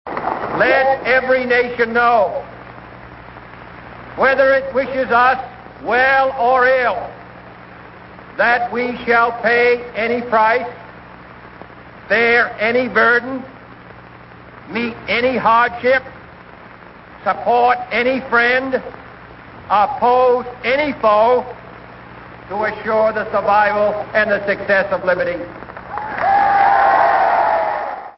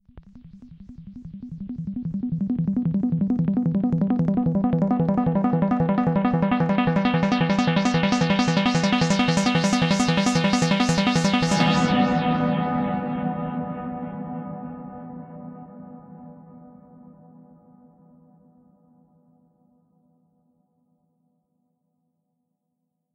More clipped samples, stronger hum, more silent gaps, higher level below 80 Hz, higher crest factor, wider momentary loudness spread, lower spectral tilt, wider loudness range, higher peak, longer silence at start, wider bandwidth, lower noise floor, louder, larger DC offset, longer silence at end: neither; first, 60 Hz at -45 dBFS vs none; neither; about the same, -50 dBFS vs -50 dBFS; about the same, 16 dB vs 18 dB; first, 22 LU vs 19 LU; first, -9 dB/octave vs -6 dB/octave; second, 3 LU vs 15 LU; first, -2 dBFS vs -6 dBFS; about the same, 0.05 s vs 0.15 s; second, 5.8 kHz vs 11 kHz; second, -39 dBFS vs -78 dBFS; first, -15 LUFS vs -22 LUFS; neither; second, 0.05 s vs 6.5 s